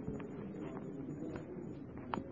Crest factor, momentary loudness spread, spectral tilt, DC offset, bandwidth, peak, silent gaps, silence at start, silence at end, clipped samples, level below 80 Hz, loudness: 24 dB; 4 LU; -7 dB/octave; under 0.1%; 7 kHz; -20 dBFS; none; 0 s; 0 s; under 0.1%; -64 dBFS; -46 LUFS